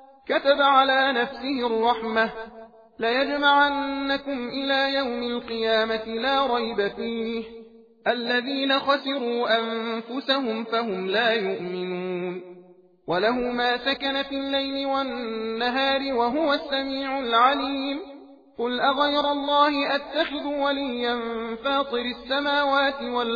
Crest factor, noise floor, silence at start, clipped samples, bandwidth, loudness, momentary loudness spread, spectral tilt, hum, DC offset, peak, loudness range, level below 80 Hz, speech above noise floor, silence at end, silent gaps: 20 dB; -52 dBFS; 0 s; under 0.1%; 5 kHz; -24 LUFS; 10 LU; -5.5 dB/octave; none; under 0.1%; -6 dBFS; 3 LU; -60 dBFS; 28 dB; 0 s; none